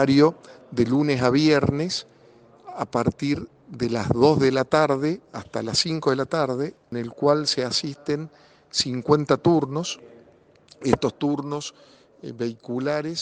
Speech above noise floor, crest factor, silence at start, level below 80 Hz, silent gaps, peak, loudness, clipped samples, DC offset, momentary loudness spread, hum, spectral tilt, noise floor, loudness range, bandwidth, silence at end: 32 dB; 20 dB; 0 s; -54 dBFS; none; -4 dBFS; -23 LUFS; under 0.1%; under 0.1%; 13 LU; none; -5.5 dB/octave; -55 dBFS; 3 LU; 9.8 kHz; 0 s